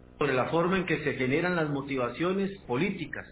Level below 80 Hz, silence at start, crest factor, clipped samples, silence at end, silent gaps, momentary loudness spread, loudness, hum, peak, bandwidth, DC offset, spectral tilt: -56 dBFS; 0.1 s; 16 dB; under 0.1%; 0 s; none; 5 LU; -29 LUFS; none; -14 dBFS; 4 kHz; under 0.1%; -5 dB/octave